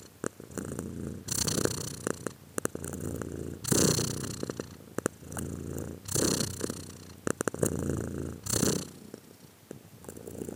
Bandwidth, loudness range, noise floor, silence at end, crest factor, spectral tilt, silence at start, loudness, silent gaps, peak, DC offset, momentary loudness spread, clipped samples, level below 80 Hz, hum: 18 kHz; 3 LU; -54 dBFS; 0 s; 28 dB; -4 dB/octave; 0 s; -32 LUFS; none; -6 dBFS; under 0.1%; 16 LU; under 0.1%; -54 dBFS; none